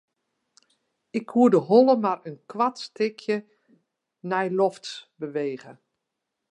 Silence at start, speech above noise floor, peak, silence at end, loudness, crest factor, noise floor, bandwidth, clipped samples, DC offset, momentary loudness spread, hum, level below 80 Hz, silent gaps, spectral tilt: 1.15 s; 59 dB; -4 dBFS; 0.8 s; -24 LUFS; 20 dB; -82 dBFS; 9.8 kHz; under 0.1%; under 0.1%; 19 LU; none; -80 dBFS; none; -6.5 dB/octave